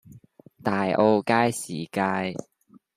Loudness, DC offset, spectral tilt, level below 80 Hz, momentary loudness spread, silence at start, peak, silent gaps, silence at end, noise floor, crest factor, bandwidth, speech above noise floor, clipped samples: -24 LUFS; under 0.1%; -5.5 dB/octave; -68 dBFS; 11 LU; 0.1 s; -6 dBFS; none; 0.55 s; -51 dBFS; 20 dB; 15 kHz; 28 dB; under 0.1%